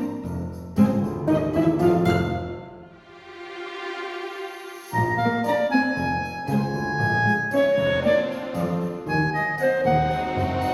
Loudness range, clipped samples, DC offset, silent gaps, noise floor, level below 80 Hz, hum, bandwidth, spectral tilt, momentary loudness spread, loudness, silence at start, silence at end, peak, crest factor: 5 LU; under 0.1%; under 0.1%; none; -45 dBFS; -46 dBFS; none; 14.5 kHz; -7 dB/octave; 14 LU; -23 LUFS; 0 s; 0 s; -6 dBFS; 18 dB